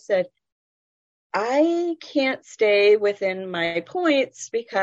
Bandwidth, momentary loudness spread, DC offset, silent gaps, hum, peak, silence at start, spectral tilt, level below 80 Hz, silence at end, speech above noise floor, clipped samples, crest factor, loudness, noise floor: 8 kHz; 9 LU; under 0.1%; 0.52-1.30 s; none; -8 dBFS; 0.1 s; -4 dB/octave; -74 dBFS; 0 s; over 68 dB; under 0.1%; 14 dB; -22 LUFS; under -90 dBFS